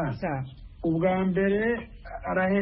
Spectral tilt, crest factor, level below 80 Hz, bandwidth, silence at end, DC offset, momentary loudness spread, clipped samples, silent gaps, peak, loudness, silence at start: -12 dB/octave; 14 dB; -46 dBFS; 5.8 kHz; 0 s; under 0.1%; 12 LU; under 0.1%; none; -12 dBFS; -27 LUFS; 0 s